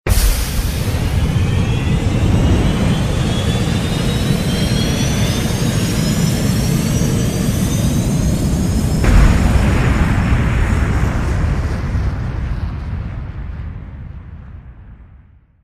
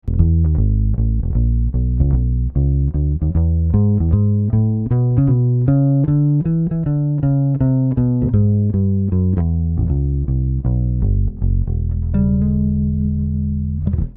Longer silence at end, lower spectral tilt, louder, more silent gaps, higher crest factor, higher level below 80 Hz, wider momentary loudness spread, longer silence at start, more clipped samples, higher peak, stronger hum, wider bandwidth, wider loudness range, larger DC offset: first, 0.45 s vs 0 s; second, -5.5 dB/octave vs -14.5 dB/octave; about the same, -17 LUFS vs -17 LUFS; neither; about the same, 16 dB vs 14 dB; about the same, -20 dBFS vs -22 dBFS; first, 12 LU vs 4 LU; about the same, 0.05 s vs 0.05 s; neither; about the same, 0 dBFS vs 0 dBFS; neither; first, 15.5 kHz vs 2 kHz; first, 8 LU vs 3 LU; neither